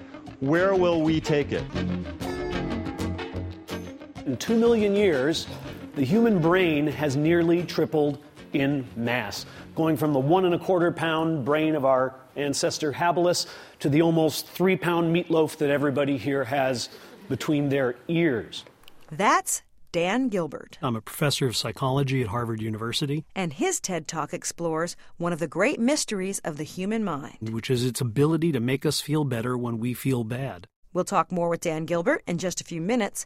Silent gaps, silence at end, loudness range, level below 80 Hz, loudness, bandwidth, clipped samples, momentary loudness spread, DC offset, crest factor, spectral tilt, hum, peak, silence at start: 30.76-30.83 s; 0 s; 4 LU; -52 dBFS; -25 LUFS; 16 kHz; under 0.1%; 11 LU; under 0.1%; 18 dB; -5 dB/octave; none; -8 dBFS; 0 s